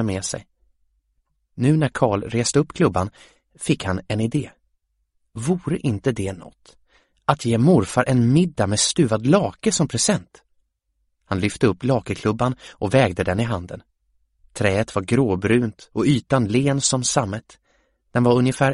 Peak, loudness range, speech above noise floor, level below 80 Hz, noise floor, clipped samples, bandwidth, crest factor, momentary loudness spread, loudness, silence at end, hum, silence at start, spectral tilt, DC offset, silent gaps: 0 dBFS; 6 LU; 51 dB; -48 dBFS; -72 dBFS; under 0.1%; 11.5 kHz; 20 dB; 11 LU; -21 LUFS; 0 s; none; 0 s; -5 dB/octave; under 0.1%; none